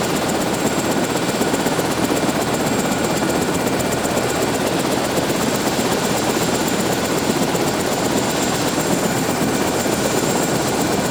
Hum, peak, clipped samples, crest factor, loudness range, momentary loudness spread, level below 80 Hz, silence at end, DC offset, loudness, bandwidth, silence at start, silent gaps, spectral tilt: none; -4 dBFS; under 0.1%; 14 dB; 0 LU; 1 LU; -44 dBFS; 0 s; under 0.1%; -19 LUFS; over 20 kHz; 0 s; none; -4 dB/octave